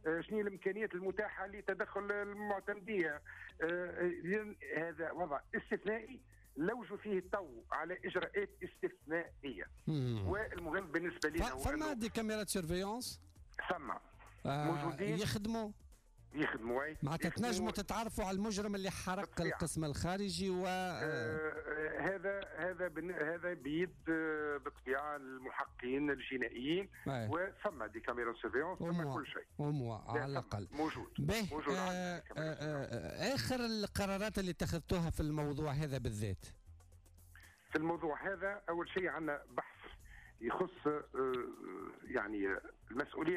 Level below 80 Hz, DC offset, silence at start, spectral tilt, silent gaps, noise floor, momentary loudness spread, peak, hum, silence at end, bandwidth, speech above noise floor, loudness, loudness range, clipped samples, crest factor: -58 dBFS; under 0.1%; 0.05 s; -5.5 dB/octave; none; -62 dBFS; 7 LU; -26 dBFS; none; 0 s; 15.5 kHz; 22 dB; -40 LUFS; 2 LU; under 0.1%; 14 dB